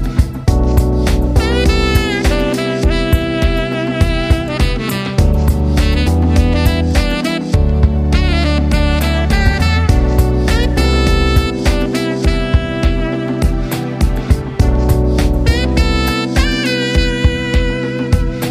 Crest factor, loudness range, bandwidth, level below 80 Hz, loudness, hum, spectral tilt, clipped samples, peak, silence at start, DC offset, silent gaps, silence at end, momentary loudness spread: 12 dB; 2 LU; 15.5 kHz; -16 dBFS; -14 LUFS; none; -6 dB/octave; under 0.1%; 0 dBFS; 0 s; under 0.1%; none; 0 s; 4 LU